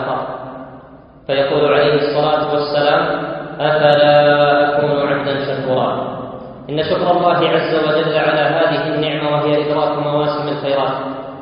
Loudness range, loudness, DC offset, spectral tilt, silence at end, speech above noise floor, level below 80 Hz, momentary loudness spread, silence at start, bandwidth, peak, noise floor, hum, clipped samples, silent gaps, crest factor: 3 LU; -15 LUFS; under 0.1%; -8.5 dB/octave; 0 s; 26 dB; -52 dBFS; 13 LU; 0 s; 5.4 kHz; 0 dBFS; -40 dBFS; none; under 0.1%; none; 16 dB